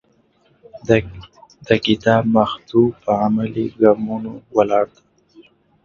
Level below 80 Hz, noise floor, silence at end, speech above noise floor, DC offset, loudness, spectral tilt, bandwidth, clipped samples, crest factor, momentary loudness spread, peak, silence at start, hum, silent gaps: -48 dBFS; -58 dBFS; 0.45 s; 41 dB; under 0.1%; -18 LUFS; -7 dB/octave; 7 kHz; under 0.1%; 18 dB; 10 LU; 0 dBFS; 0.75 s; none; none